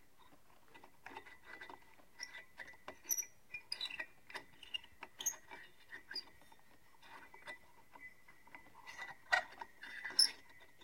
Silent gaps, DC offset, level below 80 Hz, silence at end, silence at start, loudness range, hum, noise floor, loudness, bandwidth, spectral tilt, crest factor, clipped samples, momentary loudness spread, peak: none; under 0.1%; -80 dBFS; 0 s; 0.2 s; 14 LU; none; -68 dBFS; -41 LUFS; 16.5 kHz; 1.5 dB/octave; 30 dB; under 0.1%; 22 LU; -16 dBFS